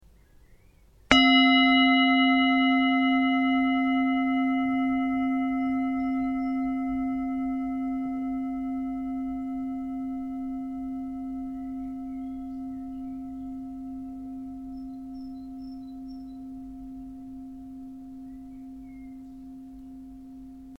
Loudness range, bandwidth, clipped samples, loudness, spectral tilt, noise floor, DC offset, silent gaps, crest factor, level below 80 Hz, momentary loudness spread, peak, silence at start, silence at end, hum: 21 LU; 7.6 kHz; under 0.1%; -25 LUFS; -4 dB/octave; -56 dBFS; under 0.1%; none; 28 dB; -52 dBFS; 23 LU; 0 dBFS; 0.5 s; 0 s; none